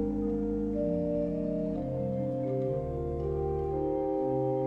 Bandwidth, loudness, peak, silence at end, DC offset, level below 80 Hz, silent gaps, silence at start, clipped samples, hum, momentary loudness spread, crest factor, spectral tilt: 5.6 kHz; -32 LUFS; -18 dBFS; 0 s; under 0.1%; -44 dBFS; none; 0 s; under 0.1%; none; 3 LU; 12 dB; -11 dB/octave